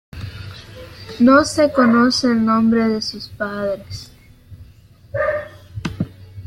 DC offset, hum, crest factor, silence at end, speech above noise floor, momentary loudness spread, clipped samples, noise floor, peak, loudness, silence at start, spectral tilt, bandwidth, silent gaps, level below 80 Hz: under 0.1%; none; 16 dB; 0 s; 29 dB; 22 LU; under 0.1%; -46 dBFS; -2 dBFS; -17 LUFS; 0.15 s; -5 dB/octave; 12.5 kHz; none; -46 dBFS